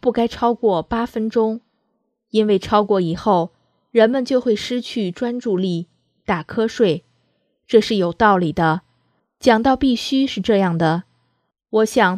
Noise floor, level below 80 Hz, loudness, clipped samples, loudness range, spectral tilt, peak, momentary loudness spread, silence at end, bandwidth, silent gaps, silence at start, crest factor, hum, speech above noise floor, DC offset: -70 dBFS; -48 dBFS; -19 LUFS; under 0.1%; 3 LU; -6 dB/octave; 0 dBFS; 8 LU; 0 s; 14 kHz; none; 0.05 s; 18 dB; none; 53 dB; under 0.1%